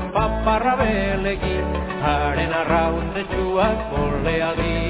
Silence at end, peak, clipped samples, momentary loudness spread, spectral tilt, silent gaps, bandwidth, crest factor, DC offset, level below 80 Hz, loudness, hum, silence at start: 0 s; -4 dBFS; under 0.1%; 5 LU; -10.5 dB/octave; none; 4 kHz; 16 dB; under 0.1%; -30 dBFS; -21 LUFS; none; 0 s